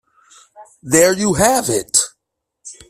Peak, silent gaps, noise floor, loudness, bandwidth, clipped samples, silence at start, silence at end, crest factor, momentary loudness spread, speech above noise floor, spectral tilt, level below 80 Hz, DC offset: 0 dBFS; none; -76 dBFS; -15 LUFS; 16 kHz; under 0.1%; 0.6 s; 0.15 s; 18 dB; 4 LU; 62 dB; -3 dB/octave; -48 dBFS; under 0.1%